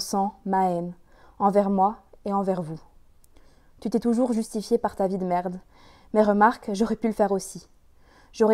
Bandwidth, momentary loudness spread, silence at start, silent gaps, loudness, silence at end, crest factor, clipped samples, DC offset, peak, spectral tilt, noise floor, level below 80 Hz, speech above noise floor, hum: 15.5 kHz; 15 LU; 0 s; none; -25 LUFS; 0 s; 20 dB; under 0.1%; under 0.1%; -6 dBFS; -6 dB/octave; -55 dBFS; -56 dBFS; 31 dB; none